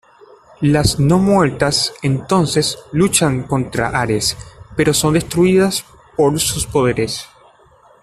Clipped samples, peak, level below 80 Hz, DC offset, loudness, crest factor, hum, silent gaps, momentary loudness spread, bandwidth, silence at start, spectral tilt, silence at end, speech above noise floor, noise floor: under 0.1%; 0 dBFS; -38 dBFS; under 0.1%; -16 LUFS; 16 dB; none; none; 7 LU; 14 kHz; 0.6 s; -4.5 dB/octave; 0.75 s; 34 dB; -49 dBFS